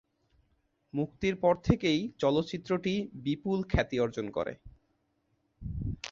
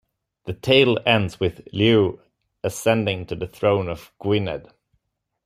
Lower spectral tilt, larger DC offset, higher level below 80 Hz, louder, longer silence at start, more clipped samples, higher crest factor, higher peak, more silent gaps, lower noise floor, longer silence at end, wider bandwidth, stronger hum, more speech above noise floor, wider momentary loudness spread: about the same, -6.5 dB/octave vs -5.5 dB/octave; neither; first, -46 dBFS vs -52 dBFS; second, -31 LUFS vs -21 LUFS; first, 0.95 s vs 0.45 s; neither; about the same, 24 dB vs 20 dB; second, -8 dBFS vs -2 dBFS; neither; about the same, -75 dBFS vs -75 dBFS; second, 0.05 s vs 0.85 s; second, 7.6 kHz vs 15 kHz; neither; second, 45 dB vs 54 dB; second, 11 LU vs 14 LU